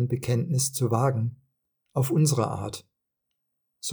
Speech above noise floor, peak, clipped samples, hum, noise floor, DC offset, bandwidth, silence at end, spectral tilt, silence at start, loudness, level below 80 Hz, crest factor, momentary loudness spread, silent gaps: 56 dB; -10 dBFS; under 0.1%; none; -81 dBFS; under 0.1%; over 20 kHz; 0 s; -5.5 dB/octave; 0 s; -26 LUFS; -64 dBFS; 18 dB; 12 LU; none